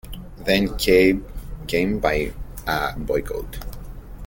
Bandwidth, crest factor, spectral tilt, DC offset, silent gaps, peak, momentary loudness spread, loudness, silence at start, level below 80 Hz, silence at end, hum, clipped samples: 17 kHz; 20 dB; -5 dB/octave; under 0.1%; none; -2 dBFS; 21 LU; -22 LUFS; 0.05 s; -34 dBFS; 0 s; none; under 0.1%